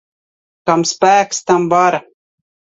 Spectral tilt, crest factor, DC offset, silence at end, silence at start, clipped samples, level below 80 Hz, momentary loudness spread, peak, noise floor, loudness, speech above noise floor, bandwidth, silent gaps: -4 dB/octave; 16 dB; under 0.1%; 0.8 s; 0.65 s; under 0.1%; -60 dBFS; 7 LU; 0 dBFS; under -90 dBFS; -14 LUFS; over 77 dB; 8 kHz; none